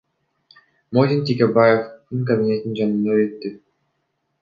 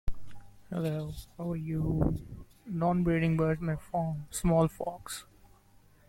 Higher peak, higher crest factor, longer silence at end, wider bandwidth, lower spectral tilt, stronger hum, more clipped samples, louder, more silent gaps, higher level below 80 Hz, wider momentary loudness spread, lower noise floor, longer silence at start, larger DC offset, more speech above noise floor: first, -2 dBFS vs -14 dBFS; about the same, 18 dB vs 18 dB; about the same, 0.85 s vs 0.85 s; second, 7.2 kHz vs 15.5 kHz; first, -9 dB/octave vs -7 dB/octave; neither; neither; first, -19 LUFS vs -32 LUFS; neither; second, -64 dBFS vs -44 dBFS; about the same, 12 LU vs 14 LU; first, -72 dBFS vs -60 dBFS; first, 0.9 s vs 0.05 s; neither; first, 54 dB vs 30 dB